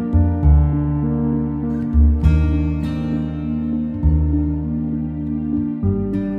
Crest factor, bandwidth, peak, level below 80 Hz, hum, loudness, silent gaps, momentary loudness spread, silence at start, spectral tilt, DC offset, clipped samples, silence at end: 14 dB; 4 kHz; -2 dBFS; -22 dBFS; none; -19 LUFS; none; 8 LU; 0 s; -11 dB/octave; under 0.1%; under 0.1%; 0 s